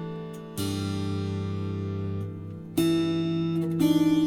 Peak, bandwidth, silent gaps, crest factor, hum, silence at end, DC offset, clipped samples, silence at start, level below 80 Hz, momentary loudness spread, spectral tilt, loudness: -12 dBFS; 18 kHz; none; 14 dB; none; 0 s; under 0.1%; under 0.1%; 0 s; -58 dBFS; 13 LU; -6.5 dB/octave; -28 LUFS